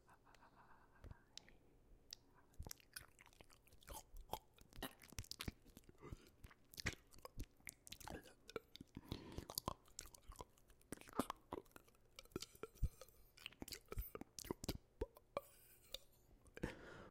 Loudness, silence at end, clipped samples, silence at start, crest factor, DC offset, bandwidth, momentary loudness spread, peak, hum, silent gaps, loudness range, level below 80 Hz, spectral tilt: -54 LUFS; 0 s; under 0.1%; 0.05 s; 34 dB; under 0.1%; 16.5 kHz; 17 LU; -20 dBFS; none; none; 6 LU; -60 dBFS; -4 dB/octave